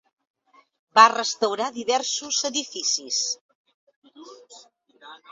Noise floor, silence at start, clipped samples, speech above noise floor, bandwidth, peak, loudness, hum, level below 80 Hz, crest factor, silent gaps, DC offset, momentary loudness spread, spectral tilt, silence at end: -48 dBFS; 0.95 s; under 0.1%; 25 dB; 8 kHz; 0 dBFS; -22 LUFS; none; -78 dBFS; 26 dB; 3.41-3.49 s, 3.55-3.65 s, 3.74-3.87 s, 3.96-4.02 s; under 0.1%; 11 LU; 0.5 dB/octave; 0.15 s